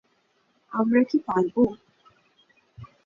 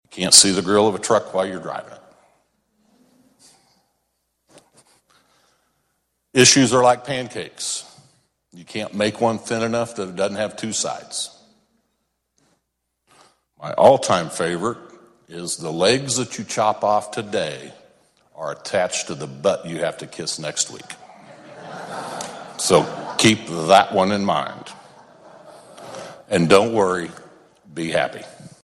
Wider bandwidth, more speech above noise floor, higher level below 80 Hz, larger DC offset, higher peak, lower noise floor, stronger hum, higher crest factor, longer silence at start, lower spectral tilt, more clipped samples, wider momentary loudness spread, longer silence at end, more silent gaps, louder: second, 7.2 kHz vs 15.5 kHz; second, 45 dB vs 55 dB; about the same, -62 dBFS vs -60 dBFS; neither; second, -8 dBFS vs 0 dBFS; second, -68 dBFS vs -75 dBFS; neither; about the same, 20 dB vs 22 dB; first, 0.7 s vs 0.1 s; first, -8.5 dB/octave vs -3 dB/octave; neither; second, 10 LU vs 21 LU; about the same, 0.2 s vs 0.2 s; neither; second, -24 LUFS vs -19 LUFS